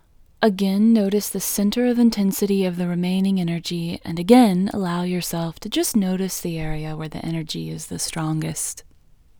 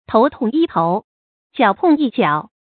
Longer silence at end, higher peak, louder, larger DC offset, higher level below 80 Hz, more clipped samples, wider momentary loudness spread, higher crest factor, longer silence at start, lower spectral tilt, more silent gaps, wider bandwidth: first, 0.6 s vs 0.3 s; about the same, 0 dBFS vs -2 dBFS; second, -21 LUFS vs -17 LUFS; neither; first, -46 dBFS vs -56 dBFS; neither; first, 11 LU vs 7 LU; about the same, 20 dB vs 16 dB; first, 0.4 s vs 0.1 s; second, -5.5 dB/octave vs -11.5 dB/octave; second, none vs 1.04-1.50 s; first, over 20 kHz vs 4.6 kHz